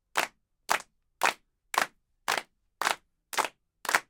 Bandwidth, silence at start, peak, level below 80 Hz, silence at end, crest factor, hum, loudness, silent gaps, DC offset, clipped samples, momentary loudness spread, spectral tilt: 19 kHz; 0.15 s; -4 dBFS; -72 dBFS; 0.1 s; 28 dB; none; -31 LUFS; none; under 0.1%; under 0.1%; 8 LU; 0 dB/octave